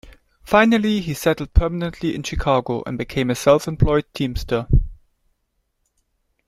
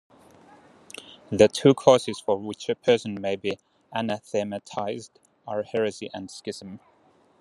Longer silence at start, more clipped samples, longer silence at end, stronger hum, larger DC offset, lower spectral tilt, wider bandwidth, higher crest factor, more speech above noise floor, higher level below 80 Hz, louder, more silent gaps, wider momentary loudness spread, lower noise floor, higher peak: second, 0.05 s vs 1.1 s; neither; first, 1.55 s vs 0.65 s; neither; neither; about the same, -6 dB/octave vs -5 dB/octave; first, 15.5 kHz vs 12.5 kHz; about the same, 20 dB vs 24 dB; first, 52 dB vs 36 dB; first, -28 dBFS vs -66 dBFS; first, -20 LUFS vs -25 LUFS; neither; second, 9 LU vs 21 LU; first, -71 dBFS vs -61 dBFS; about the same, -2 dBFS vs -2 dBFS